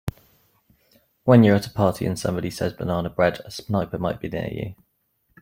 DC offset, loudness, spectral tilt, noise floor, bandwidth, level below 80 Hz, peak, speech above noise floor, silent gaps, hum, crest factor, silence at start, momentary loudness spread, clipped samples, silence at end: under 0.1%; -22 LUFS; -7 dB/octave; -69 dBFS; 16.5 kHz; -50 dBFS; -4 dBFS; 48 dB; none; none; 20 dB; 0.05 s; 15 LU; under 0.1%; 0.7 s